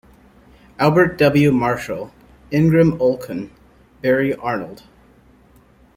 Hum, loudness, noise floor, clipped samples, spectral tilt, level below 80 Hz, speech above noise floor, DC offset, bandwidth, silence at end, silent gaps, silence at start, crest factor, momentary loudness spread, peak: none; -17 LUFS; -51 dBFS; under 0.1%; -7.5 dB/octave; -48 dBFS; 34 dB; under 0.1%; 16.5 kHz; 1.25 s; none; 0.8 s; 18 dB; 15 LU; -2 dBFS